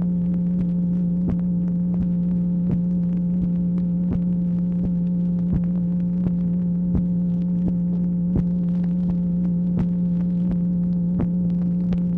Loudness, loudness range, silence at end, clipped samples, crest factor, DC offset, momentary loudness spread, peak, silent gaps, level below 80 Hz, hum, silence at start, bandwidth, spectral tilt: -22 LUFS; 0 LU; 0 s; under 0.1%; 12 dB; under 0.1%; 1 LU; -10 dBFS; none; -38 dBFS; none; 0 s; 1.8 kHz; -12.5 dB/octave